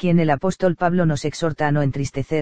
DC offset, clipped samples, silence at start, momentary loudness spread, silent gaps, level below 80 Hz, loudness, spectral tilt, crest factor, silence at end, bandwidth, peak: 2%; under 0.1%; 0 s; 6 LU; none; -44 dBFS; -21 LUFS; -7 dB/octave; 16 dB; 0 s; 9.2 kHz; -4 dBFS